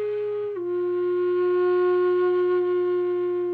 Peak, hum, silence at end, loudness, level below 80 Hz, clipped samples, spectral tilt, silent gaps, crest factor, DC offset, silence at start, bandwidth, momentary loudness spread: -16 dBFS; none; 0 s; -23 LUFS; -74 dBFS; under 0.1%; -8.5 dB/octave; none; 6 dB; under 0.1%; 0 s; 4.6 kHz; 6 LU